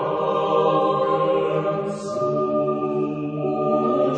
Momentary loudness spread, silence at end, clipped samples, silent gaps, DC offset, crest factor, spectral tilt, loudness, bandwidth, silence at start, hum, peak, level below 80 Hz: 6 LU; 0 s; under 0.1%; none; under 0.1%; 14 dB; -7.5 dB/octave; -22 LUFS; 9.4 kHz; 0 s; none; -8 dBFS; -62 dBFS